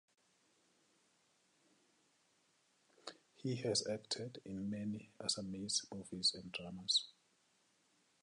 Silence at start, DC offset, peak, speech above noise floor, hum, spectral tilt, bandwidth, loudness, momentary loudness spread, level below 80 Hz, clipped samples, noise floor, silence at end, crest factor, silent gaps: 3.05 s; under 0.1%; -22 dBFS; 35 dB; none; -3 dB/octave; 11 kHz; -40 LUFS; 17 LU; -76 dBFS; under 0.1%; -77 dBFS; 1.1 s; 22 dB; none